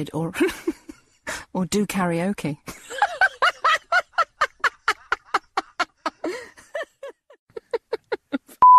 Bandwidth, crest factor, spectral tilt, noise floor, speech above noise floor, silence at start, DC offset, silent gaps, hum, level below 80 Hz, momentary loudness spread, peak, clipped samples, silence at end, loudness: 14 kHz; 18 dB; -4 dB/octave; -42 dBFS; 17 dB; 0 s; under 0.1%; 7.39-7.47 s; none; -58 dBFS; 17 LU; -6 dBFS; under 0.1%; 0 s; -24 LUFS